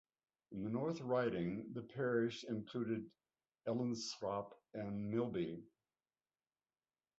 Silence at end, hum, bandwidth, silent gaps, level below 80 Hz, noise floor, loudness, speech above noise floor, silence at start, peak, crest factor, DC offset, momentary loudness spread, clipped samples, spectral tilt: 1.55 s; none; 7.6 kHz; none; -74 dBFS; under -90 dBFS; -42 LUFS; over 49 dB; 0.5 s; -24 dBFS; 18 dB; under 0.1%; 11 LU; under 0.1%; -6 dB/octave